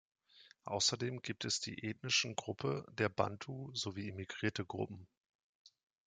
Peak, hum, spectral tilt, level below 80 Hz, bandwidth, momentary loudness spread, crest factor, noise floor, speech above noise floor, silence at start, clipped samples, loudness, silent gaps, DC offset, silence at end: -16 dBFS; none; -3 dB/octave; -76 dBFS; 10 kHz; 11 LU; 26 dB; -65 dBFS; 26 dB; 0.35 s; under 0.1%; -38 LUFS; 5.17-5.65 s; under 0.1%; 0.4 s